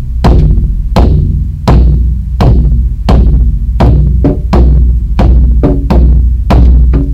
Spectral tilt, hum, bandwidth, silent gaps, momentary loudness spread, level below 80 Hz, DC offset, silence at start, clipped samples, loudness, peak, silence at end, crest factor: -9 dB/octave; none; 5.8 kHz; none; 5 LU; -6 dBFS; under 0.1%; 0 s; 4%; -9 LUFS; 0 dBFS; 0 s; 6 dB